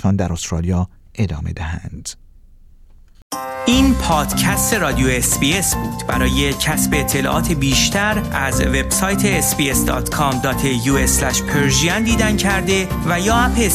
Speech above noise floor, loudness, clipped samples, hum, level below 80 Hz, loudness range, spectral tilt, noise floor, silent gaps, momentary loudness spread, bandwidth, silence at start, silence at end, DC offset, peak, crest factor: 27 dB; -16 LUFS; under 0.1%; none; -28 dBFS; 5 LU; -4 dB/octave; -44 dBFS; 3.22-3.30 s; 9 LU; 16 kHz; 0 s; 0 s; under 0.1%; -2 dBFS; 16 dB